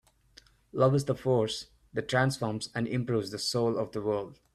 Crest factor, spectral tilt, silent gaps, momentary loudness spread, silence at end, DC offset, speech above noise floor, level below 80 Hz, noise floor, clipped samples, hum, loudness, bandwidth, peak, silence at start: 20 dB; -5.5 dB/octave; none; 9 LU; 0.2 s; under 0.1%; 31 dB; -62 dBFS; -60 dBFS; under 0.1%; none; -30 LUFS; 13 kHz; -10 dBFS; 0.75 s